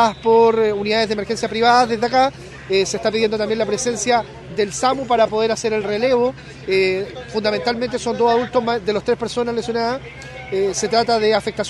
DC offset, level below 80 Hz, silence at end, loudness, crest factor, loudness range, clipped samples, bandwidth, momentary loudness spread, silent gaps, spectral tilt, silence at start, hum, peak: under 0.1%; -48 dBFS; 0 s; -18 LUFS; 18 dB; 3 LU; under 0.1%; 12 kHz; 8 LU; none; -3.5 dB/octave; 0 s; none; 0 dBFS